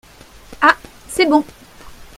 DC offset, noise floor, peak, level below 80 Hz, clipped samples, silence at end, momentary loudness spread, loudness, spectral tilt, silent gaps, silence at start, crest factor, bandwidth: under 0.1%; -42 dBFS; 0 dBFS; -46 dBFS; under 0.1%; 0.15 s; 12 LU; -16 LUFS; -3 dB/octave; none; 0.5 s; 20 dB; 16 kHz